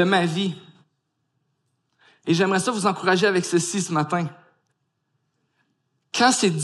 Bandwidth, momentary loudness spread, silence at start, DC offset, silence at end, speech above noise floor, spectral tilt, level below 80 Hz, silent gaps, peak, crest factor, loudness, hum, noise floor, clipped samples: 12.5 kHz; 11 LU; 0 s; under 0.1%; 0 s; 53 dB; -4 dB/octave; -72 dBFS; none; -4 dBFS; 20 dB; -22 LUFS; none; -74 dBFS; under 0.1%